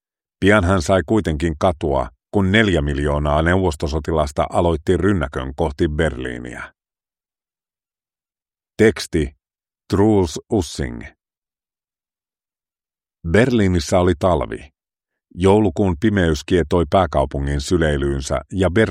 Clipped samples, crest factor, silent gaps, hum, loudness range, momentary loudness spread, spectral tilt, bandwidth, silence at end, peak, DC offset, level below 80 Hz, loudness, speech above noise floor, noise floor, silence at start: under 0.1%; 18 dB; 11.38-11.42 s; none; 7 LU; 10 LU; -6.5 dB/octave; 14.5 kHz; 0 s; 0 dBFS; under 0.1%; -32 dBFS; -18 LUFS; over 73 dB; under -90 dBFS; 0.4 s